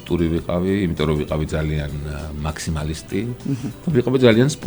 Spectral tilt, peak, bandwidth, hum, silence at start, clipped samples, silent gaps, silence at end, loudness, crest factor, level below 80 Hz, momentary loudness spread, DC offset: -6.5 dB/octave; 0 dBFS; over 20 kHz; none; 0 s; under 0.1%; none; 0 s; -21 LUFS; 20 dB; -34 dBFS; 12 LU; under 0.1%